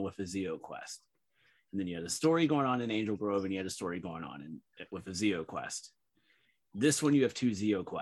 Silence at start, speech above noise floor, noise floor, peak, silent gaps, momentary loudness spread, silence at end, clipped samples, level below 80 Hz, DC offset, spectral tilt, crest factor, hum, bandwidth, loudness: 0 s; 40 dB; -73 dBFS; -16 dBFS; none; 17 LU; 0 s; under 0.1%; -70 dBFS; under 0.1%; -5 dB/octave; 18 dB; none; 12.5 kHz; -33 LUFS